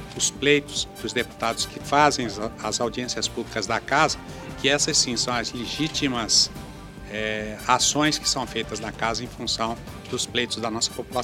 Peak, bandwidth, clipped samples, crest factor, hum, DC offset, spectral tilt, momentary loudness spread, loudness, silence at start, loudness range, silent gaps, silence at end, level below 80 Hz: -2 dBFS; 17 kHz; under 0.1%; 22 dB; none; under 0.1%; -2.5 dB/octave; 10 LU; -23 LUFS; 0 s; 3 LU; none; 0 s; -46 dBFS